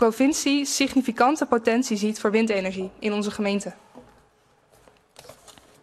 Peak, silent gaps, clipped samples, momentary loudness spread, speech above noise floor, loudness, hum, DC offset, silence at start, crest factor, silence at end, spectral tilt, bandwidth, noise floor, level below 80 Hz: -6 dBFS; none; under 0.1%; 8 LU; 38 dB; -23 LUFS; none; under 0.1%; 0 s; 20 dB; 0.3 s; -4 dB/octave; 13.5 kHz; -61 dBFS; -62 dBFS